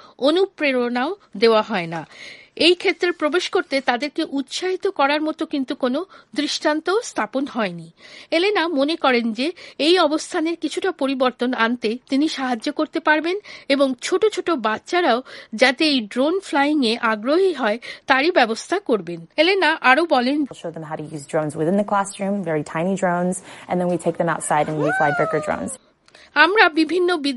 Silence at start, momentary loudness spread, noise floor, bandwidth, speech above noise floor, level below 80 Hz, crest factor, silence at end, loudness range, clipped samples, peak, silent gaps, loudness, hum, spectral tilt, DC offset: 0.2 s; 10 LU; -51 dBFS; 11.5 kHz; 31 dB; -66 dBFS; 20 dB; 0 s; 4 LU; under 0.1%; 0 dBFS; none; -20 LUFS; none; -4 dB/octave; under 0.1%